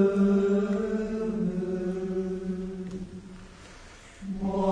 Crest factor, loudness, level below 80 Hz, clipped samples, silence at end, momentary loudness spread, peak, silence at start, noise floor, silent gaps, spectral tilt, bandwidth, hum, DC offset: 16 dB; -29 LUFS; -50 dBFS; under 0.1%; 0 s; 24 LU; -12 dBFS; 0 s; -48 dBFS; none; -8.5 dB/octave; 9.8 kHz; none; under 0.1%